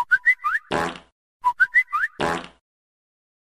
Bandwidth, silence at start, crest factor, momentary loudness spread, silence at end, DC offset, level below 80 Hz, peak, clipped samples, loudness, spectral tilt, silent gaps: 15 kHz; 0 s; 16 dB; 11 LU; 1.1 s; 0.1%; -56 dBFS; -8 dBFS; under 0.1%; -21 LUFS; -3.5 dB/octave; 1.12-1.40 s